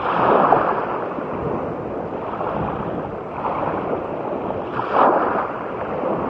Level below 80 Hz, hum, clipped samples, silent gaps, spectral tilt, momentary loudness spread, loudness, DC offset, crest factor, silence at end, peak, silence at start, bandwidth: -48 dBFS; none; under 0.1%; none; -9 dB/octave; 11 LU; -22 LUFS; under 0.1%; 22 dB; 0 s; 0 dBFS; 0 s; 7.4 kHz